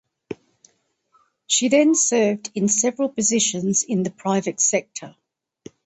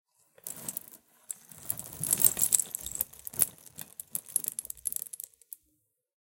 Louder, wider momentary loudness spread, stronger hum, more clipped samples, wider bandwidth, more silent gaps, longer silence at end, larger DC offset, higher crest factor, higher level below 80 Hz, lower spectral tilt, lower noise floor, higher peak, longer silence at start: first, -19 LUFS vs -29 LUFS; about the same, 20 LU vs 20 LU; neither; neither; second, 8.8 kHz vs 17 kHz; neither; second, 0.75 s vs 1.15 s; neither; second, 18 dB vs 32 dB; about the same, -66 dBFS vs -66 dBFS; first, -3 dB/octave vs -0.5 dB/octave; second, -64 dBFS vs -76 dBFS; about the same, -4 dBFS vs -2 dBFS; second, 0.3 s vs 0.45 s